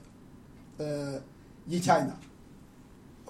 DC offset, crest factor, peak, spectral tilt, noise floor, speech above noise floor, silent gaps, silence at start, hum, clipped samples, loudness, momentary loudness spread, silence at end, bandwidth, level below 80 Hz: under 0.1%; 24 dB; -12 dBFS; -5.5 dB/octave; -53 dBFS; 23 dB; none; 0 s; none; under 0.1%; -31 LUFS; 27 LU; 0 s; 16 kHz; -60 dBFS